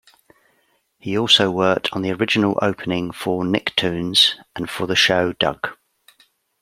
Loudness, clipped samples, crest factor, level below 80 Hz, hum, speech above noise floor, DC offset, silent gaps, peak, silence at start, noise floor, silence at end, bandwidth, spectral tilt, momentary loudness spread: -18 LUFS; under 0.1%; 20 dB; -56 dBFS; none; 45 dB; under 0.1%; none; 0 dBFS; 1.05 s; -64 dBFS; 0.9 s; 16 kHz; -4 dB/octave; 12 LU